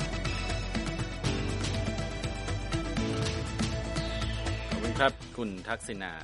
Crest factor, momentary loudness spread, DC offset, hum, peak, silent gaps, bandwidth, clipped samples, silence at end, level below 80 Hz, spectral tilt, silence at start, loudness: 22 dB; 7 LU; under 0.1%; none; -10 dBFS; none; 11.5 kHz; under 0.1%; 0 s; -38 dBFS; -5 dB/octave; 0 s; -33 LUFS